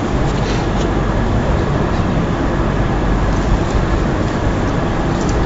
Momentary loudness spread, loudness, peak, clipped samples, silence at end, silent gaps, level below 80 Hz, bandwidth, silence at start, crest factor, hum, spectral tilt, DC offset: 1 LU; -17 LUFS; -4 dBFS; under 0.1%; 0 s; none; -20 dBFS; 7.8 kHz; 0 s; 12 dB; none; -7 dB/octave; under 0.1%